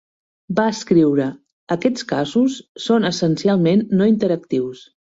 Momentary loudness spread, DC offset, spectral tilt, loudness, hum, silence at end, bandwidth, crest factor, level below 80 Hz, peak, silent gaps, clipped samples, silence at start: 8 LU; under 0.1%; -6.5 dB/octave; -18 LUFS; none; 0.35 s; 8 kHz; 16 dB; -58 dBFS; -4 dBFS; 1.53-1.67 s, 2.69-2.75 s; under 0.1%; 0.5 s